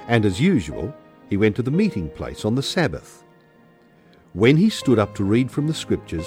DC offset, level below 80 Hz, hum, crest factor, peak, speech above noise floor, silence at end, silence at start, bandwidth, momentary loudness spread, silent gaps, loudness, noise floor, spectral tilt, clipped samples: under 0.1%; -46 dBFS; none; 18 dB; -2 dBFS; 33 dB; 0 s; 0 s; 16 kHz; 13 LU; none; -21 LUFS; -53 dBFS; -6.5 dB/octave; under 0.1%